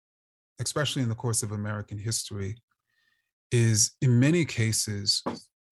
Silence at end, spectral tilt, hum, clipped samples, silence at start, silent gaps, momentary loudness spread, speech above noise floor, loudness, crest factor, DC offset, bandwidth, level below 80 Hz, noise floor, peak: 0.3 s; -4 dB/octave; none; under 0.1%; 0.6 s; 2.63-2.68 s, 3.33-3.50 s; 13 LU; 46 dB; -26 LUFS; 18 dB; under 0.1%; 13 kHz; -62 dBFS; -73 dBFS; -10 dBFS